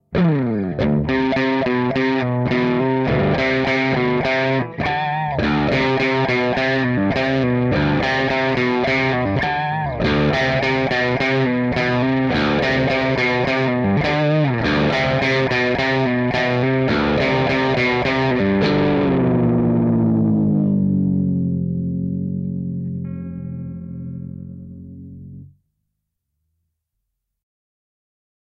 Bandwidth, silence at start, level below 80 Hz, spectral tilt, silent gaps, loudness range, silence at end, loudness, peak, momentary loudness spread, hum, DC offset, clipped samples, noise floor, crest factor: 7.4 kHz; 0.1 s; -40 dBFS; -7.5 dB/octave; none; 9 LU; 3.05 s; -18 LUFS; -8 dBFS; 9 LU; none; under 0.1%; under 0.1%; -77 dBFS; 12 dB